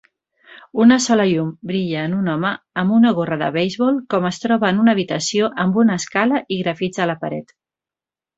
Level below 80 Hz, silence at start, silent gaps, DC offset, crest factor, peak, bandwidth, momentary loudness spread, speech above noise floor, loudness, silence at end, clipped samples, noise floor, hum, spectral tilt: -60 dBFS; 0.75 s; none; under 0.1%; 16 dB; -2 dBFS; 8 kHz; 8 LU; 72 dB; -18 LUFS; 0.95 s; under 0.1%; -90 dBFS; none; -5.5 dB/octave